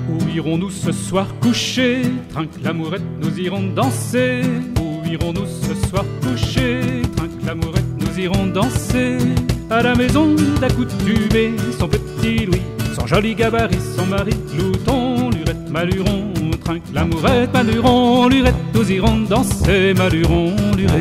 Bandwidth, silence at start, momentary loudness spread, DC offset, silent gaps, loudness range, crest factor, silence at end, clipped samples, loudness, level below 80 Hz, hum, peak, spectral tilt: 16 kHz; 0 s; 8 LU; under 0.1%; none; 5 LU; 14 dB; 0 s; under 0.1%; -18 LUFS; -30 dBFS; none; -2 dBFS; -6 dB/octave